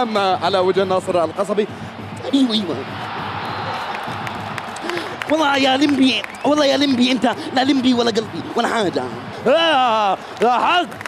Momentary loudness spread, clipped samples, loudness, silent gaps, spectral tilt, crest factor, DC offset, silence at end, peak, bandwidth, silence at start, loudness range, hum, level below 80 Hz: 11 LU; under 0.1%; -18 LUFS; none; -4.5 dB/octave; 14 dB; under 0.1%; 0 s; -4 dBFS; 13.5 kHz; 0 s; 6 LU; none; -58 dBFS